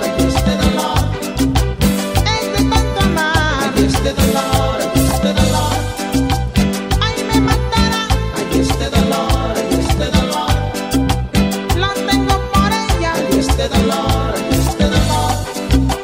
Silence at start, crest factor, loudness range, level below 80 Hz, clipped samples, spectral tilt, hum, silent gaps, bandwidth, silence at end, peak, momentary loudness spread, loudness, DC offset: 0 s; 14 dB; 1 LU; -22 dBFS; under 0.1%; -5 dB/octave; none; none; 16.5 kHz; 0 s; 0 dBFS; 3 LU; -15 LUFS; 0.2%